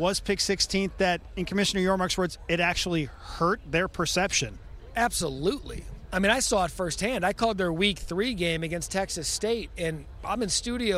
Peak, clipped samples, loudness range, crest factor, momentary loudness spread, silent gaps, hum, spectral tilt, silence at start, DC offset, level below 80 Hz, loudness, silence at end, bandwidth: -8 dBFS; under 0.1%; 2 LU; 18 dB; 8 LU; none; none; -3.5 dB/octave; 0 s; under 0.1%; -44 dBFS; -27 LUFS; 0 s; 16 kHz